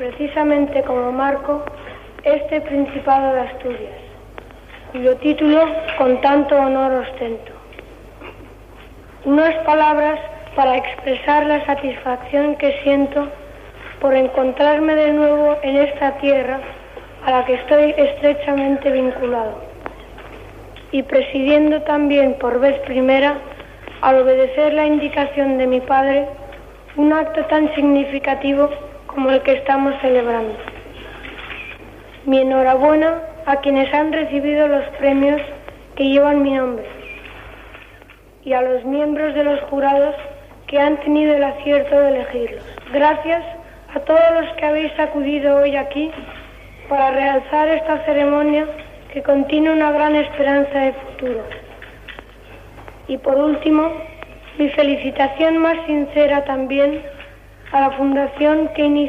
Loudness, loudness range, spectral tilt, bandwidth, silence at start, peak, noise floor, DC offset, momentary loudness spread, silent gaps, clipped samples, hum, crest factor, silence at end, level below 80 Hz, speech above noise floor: -17 LUFS; 4 LU; -6.5 dB/octave; 5.8 kHz; 0 s; -2 dBFS; -44 dBFS; under 0.1%; 19 LU; none; under 0.1%; none; 14 dB; 0 s; -44 dBFS; 28 dB